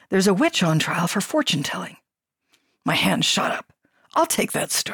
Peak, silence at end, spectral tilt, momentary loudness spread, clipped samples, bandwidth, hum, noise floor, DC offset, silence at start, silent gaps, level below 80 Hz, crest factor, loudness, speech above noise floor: -8 dBFS; 0 s; -3.5 dB/octave; 10 LU; under 0.1%; 19 kHz; none; -78 dBFS; under 0.1%; 0.1 s; none; -64 dBFS; 14 dB; -21 LUFS; 57 dB